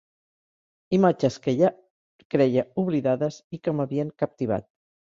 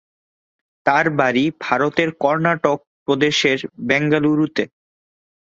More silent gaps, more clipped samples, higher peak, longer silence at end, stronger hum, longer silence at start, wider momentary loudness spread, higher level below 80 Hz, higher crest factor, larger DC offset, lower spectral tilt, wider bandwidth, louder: first, 1.90-2.19 s, 2.25-2.30 s, 3.44-3.50 s vs 2.87-3.06 s; neither; second, -6 dBFS vs -2 dBFS; second, 0.45 s vs 0.85 s; neither; about the same, 0.9 s vs 0.85 s; about the same, 8 LU vs 7 LU; about the same, -62 dBFS vs -62 dBFS; about the same, 18 dB vs 18 dB; neither; first, -7.5 dB/octave vs -5 dB/octave; about the same, 7.6 kHz vs 7.8 kHz; second, -25 LUFS vs -18 LUFS